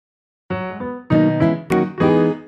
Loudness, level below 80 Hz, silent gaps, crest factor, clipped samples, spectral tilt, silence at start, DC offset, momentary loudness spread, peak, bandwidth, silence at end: -18 LUFS; -48 dBFS; none; 16 dB; under 0.1%; -8.5 dB/octave; 0.5 s; under 0.1%; 12 LU; -4 dBFS; 12 kHz; 0 s